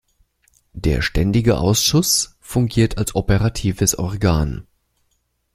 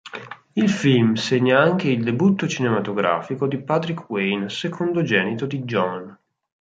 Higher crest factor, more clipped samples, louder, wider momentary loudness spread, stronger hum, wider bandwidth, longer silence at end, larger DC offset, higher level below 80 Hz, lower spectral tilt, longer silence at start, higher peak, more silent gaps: about the same, 18 dB vs 18 dB; neither; first, -18 LUFS vs -21 LUFS; about the same, 7 LU vs 9 LU; neither; first, 16 kHz vs 9 kHz; first, 0.9 s vs 0.5 s; neither; first, -32 dBFS vs -62 dBFS; second, -4.5 dB/octave vs -6 dB/octave; first, 0.75 s vs 0.05 s; about the same, -2 dBFS vs -2 dBFS; neither